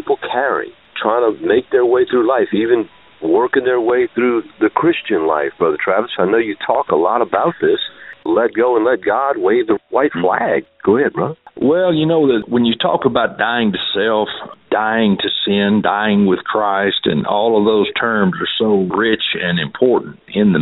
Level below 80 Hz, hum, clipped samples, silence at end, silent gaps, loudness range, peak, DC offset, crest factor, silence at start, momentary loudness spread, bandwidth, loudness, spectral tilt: -54 dBFS; none; under 0.1%; 0 s; none; 1 LU; 0 dBFS; under 0.1%; 16 dB; 0 s; 5 LU; 4.1 kHz; -15 LUFS; -3.5 dB/octave